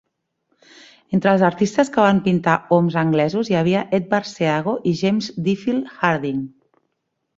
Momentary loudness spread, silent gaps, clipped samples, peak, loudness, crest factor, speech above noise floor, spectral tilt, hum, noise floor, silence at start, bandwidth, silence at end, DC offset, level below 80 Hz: 7 LU; none; under 0.1%; -2 dBFS; -19 LUFS; 18 dB; 56 dB; -6.5 dB/octave; none; -75 dBFS; 1.1 s; 7.8 kHz; 0.9 s; under 0.1%; -58 dBFS